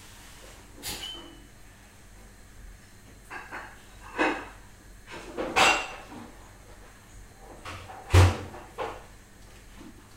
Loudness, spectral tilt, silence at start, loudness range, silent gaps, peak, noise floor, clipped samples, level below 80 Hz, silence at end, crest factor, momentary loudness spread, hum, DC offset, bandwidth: -27 LUFS; -4.5 dB/octave; 0 s; 15 LU; none; -6 dBFS; -51 dBFS; under 0.1%; -46 dBFS; 0 s; 26 dB; 29 LU; none; under 0.1%; 16 kHz